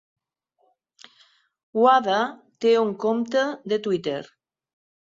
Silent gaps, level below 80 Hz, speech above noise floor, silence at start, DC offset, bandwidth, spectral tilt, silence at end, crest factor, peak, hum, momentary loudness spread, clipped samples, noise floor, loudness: none; -72 dBFS; 49 dB; 1.75 s; under 0.1%; 7.6 kHz; -5 dB/octave; 0.85 s; 20 dB; -6 dBFS; none; 12 LU; under 0.1%; -70 dBFS; -23 LUFS